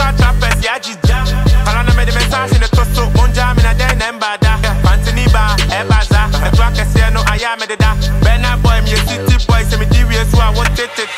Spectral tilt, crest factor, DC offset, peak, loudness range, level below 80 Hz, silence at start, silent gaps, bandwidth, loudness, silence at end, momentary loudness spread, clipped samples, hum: -5 dB/octave; 10 dB; under 0.1%; 0 dBFS; 0 LU; -12 dBFS; 0 s; none; 15.5 kHz; -13 LUFS; 0 s; 3 LU; under 0.1%; none